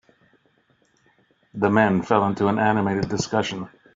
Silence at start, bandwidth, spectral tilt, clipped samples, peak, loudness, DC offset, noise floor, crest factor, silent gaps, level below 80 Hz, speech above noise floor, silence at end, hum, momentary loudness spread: 1.55 s; 7.8 kHz; -5 dB/octave; under 0.1%; -4 dBFS; -21 LUFS; under 0.1%; -63 dBFS; 20 dB; none; -56 dBFS; 43 dB; 0.3 s; none; 9 LU